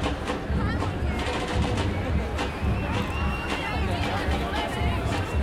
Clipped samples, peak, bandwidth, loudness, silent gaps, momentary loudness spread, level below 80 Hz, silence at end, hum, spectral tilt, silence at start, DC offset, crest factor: under 0.1%; -12 dBFS; 14 kHz; -27 LUFS; none; 2 LU; -32 dBFS; 0 s; none; -6 dB/octave; 0 s; under 0.1%; 14 dB